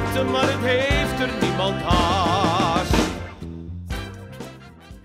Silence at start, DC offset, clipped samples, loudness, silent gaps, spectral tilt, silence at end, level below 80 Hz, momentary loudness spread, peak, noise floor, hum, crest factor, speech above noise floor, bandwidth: 0 s; under 0.1%; under 0.1%; -21 LUFS; none; -5 dB/octave; 0.05 s; -34 dBFS; 16 LU; -6 dBFS; -42 dBFS; none; 16 dB; 22 dB; 16 kHz